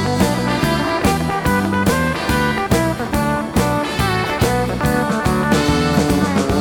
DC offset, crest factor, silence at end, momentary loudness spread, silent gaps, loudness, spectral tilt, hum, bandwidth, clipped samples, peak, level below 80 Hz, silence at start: under 0.1%; 16 dB; 0 s; 3 LU; none; -17 LUFS; -5.5 dB/octave; none; over 20 kHz; under 0.1%; -2 dBFS; -30 dBFS; 0 s